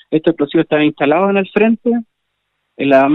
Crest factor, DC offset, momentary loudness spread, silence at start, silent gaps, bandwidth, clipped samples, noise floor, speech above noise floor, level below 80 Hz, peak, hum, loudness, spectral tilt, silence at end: 14 dB; under 0.1%; 5 LU; 0.1 s; none; 4.9 kHz; under 0.1%; -70 dBFS; 57 dB; -56 dBFS; 0 dBFS; 50 Hz at -55 dBFS; -14 LUFS; -8.5 dB/octave; 0 s